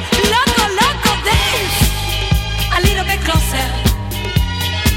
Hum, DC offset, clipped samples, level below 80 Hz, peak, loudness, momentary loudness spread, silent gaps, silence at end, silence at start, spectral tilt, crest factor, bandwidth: none; under 0.1%; under 0.1%; -22 dBFS; 0 dBFS; -15 LUFS; 5 LU; none; 0 s; 0 s; -3.5 dB/octave; 14 dB; 17 kHz